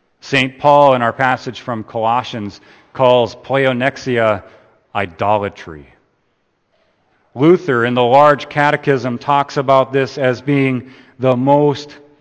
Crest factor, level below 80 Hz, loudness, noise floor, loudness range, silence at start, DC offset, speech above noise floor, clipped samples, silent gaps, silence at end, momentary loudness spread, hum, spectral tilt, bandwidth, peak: 16 dB; -56 dBFS; -15 LUFS; -64 dBFS; 6 LU; 0.25 s; under 0.1%; 49 dB; under 0.1%; none; 0.25 s; 15 LU; none; -6.5 dB/octave; 8.8 kHz; 0 dBFS